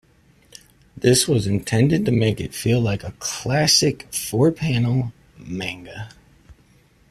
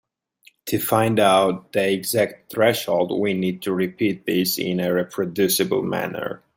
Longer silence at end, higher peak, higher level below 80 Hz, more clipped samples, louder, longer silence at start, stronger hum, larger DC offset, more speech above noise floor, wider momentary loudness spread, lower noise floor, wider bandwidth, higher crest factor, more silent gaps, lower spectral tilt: first, 0.6 s vs 0.2 s; about the same, -2 dBFS vs -4 dBFS; first, -48 dBFS vs -62 dBFS; neither; about the same, -20 LUFS vs -21 LUFS; first, 0.95 s vs 0.65 s; neither; neither; about the same, 35 dB vs 36 dB; first, 15 LU vs 8 LU; about the same, -55 dBFS vs -57 dBFS; second, 14.5 kHz vs 16.5 kHz; about the same, 18 dB vs 18 dB; neither; about the same, -4.5 dB/octave vs -4.5 dB/octave